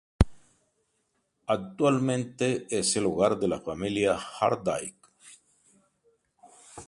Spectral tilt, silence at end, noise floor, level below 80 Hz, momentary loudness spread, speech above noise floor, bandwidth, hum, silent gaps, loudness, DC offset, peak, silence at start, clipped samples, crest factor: -5 dB/octave; 0.05 s; -75 dBFS; -42 dBFS; 7 LU; 48 dB; 11.5 kHz; none; none; -28 LUFS; under 0.1%; -4 dBFS; 0.2 s; under 0.1%; 26 dB